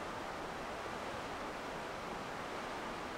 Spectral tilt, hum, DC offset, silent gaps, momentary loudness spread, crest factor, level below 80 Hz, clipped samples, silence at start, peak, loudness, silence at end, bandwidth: -4 dB/octave; none; under 0.1%; none; 1 LU; 14 dB; -62 dBFS; under 0.1%; 0 s; -30 dBFS; -43 LUFS; 0 s; 16 kHz